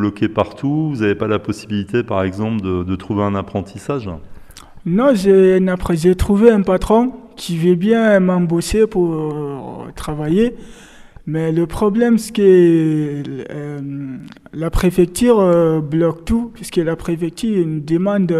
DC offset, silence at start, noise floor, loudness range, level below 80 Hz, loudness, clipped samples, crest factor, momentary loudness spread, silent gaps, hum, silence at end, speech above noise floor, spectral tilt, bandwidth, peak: under 0.1%; 0 s; -37 dBFS; 6 LU; -34 dBFS; -16 LUFS; under 0.1%; 16 dB; 15 LU; none; none; 0 s; 21 dB; -7 dB/octave; 14 kHz; 0 dBFS